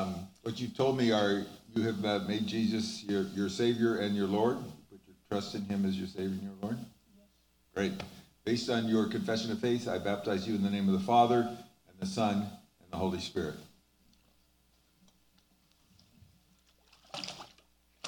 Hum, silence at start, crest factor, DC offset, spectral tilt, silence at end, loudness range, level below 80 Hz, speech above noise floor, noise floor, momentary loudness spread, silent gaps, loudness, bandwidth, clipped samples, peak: none; 0 s; 22 dB; under 0.1%; -6 dB/octave; 0 s; 11 LU; -70 dBFS; 38 dB; -69 dBFS; 14 LU; none; -33 LUFS; 18 kHz; under 0.1%; -12 dBFS